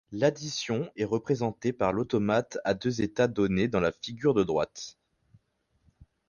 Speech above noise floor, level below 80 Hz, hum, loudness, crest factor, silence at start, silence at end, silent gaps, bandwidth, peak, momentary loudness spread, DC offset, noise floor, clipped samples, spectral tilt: 44 dB; -56 dBFS; none; -28 LUFS; 18 dB; 0.1 s; 1.4 s; none; 10 kHz; -12 dBFS; 5 LU; under 0.1%; -72 dBFS; under 0.1%; -6 dB/octave